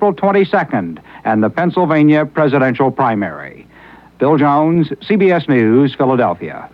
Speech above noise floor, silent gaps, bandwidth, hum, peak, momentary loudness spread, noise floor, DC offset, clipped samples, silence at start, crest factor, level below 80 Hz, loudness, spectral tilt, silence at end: 28 dB; none; 5.4 kHz; none; -2 dBFS; 9 LU; -41 dBFS; under 0.1%; under 0.1%; 0 s; 12 dB; -54 dBFS; -14 LUFS; -9.5 dB/octave; 0.05 s